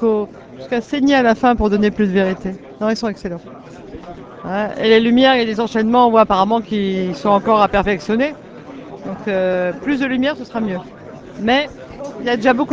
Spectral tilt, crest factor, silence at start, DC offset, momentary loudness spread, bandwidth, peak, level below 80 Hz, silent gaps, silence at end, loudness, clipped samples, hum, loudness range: -6 dB/octave; 16 dB; 0 s; under 0.1%; 22 LU; 7.8 kHz; 0 dBFS; -40 dBFS; none; 0 s; -16 LUFS; under 0.1%; none; 6 LU